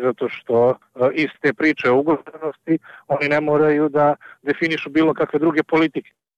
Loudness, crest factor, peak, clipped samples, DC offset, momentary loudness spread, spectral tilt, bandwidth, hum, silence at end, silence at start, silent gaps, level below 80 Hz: -19 LUFS; 12 dB; -8 dBFS; under 0.1%; under 0.1%; 9 LU; -7.5 dB/octave; 7.4 kHz; none; 0.35 s; 0 s; none; -62 dBFS